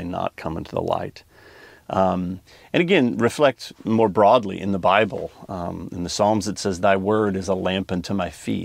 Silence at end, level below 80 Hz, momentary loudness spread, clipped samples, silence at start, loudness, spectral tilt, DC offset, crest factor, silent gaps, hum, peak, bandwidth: 0 s; -52 dBFS; 13 LU; under 0.1%; 0 s; -22 LUFS; -5.5 dB/octave; under 0.1%; 20 dB; none; none; -2 dBFS; 16 kHz